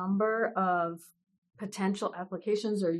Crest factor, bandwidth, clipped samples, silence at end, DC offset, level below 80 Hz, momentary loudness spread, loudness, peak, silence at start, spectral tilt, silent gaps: 14 dB; 12.5 kHz; under 0.1%; 0 s; under 0.1%; -80 dBFS; 12 LU; -31 LUFS; -18 dBFS; 0 s; -6 dB/octave; 1.38-1.42 s